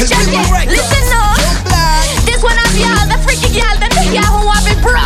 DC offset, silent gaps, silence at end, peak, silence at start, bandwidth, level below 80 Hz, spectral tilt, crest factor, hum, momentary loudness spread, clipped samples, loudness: under 0.1%; none; 0 s; 0 dBFS; 0 s; 15.5 kHz; -12 dBFS; -3.5 dB/octave; 10 dB; none; 2 LU; under 0.1%; -11 LUFS